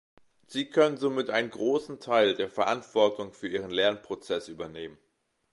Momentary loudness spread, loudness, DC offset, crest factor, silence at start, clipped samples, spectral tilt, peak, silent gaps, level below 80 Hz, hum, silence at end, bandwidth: 13 LU; -28 LUFS; under 0.1%; 20 dB; 0.5 s; under 0.1%; -4.5 dB/octave; -10 dBFS; none; -68 dBFS; none; 0.6 s; 11.5 kHz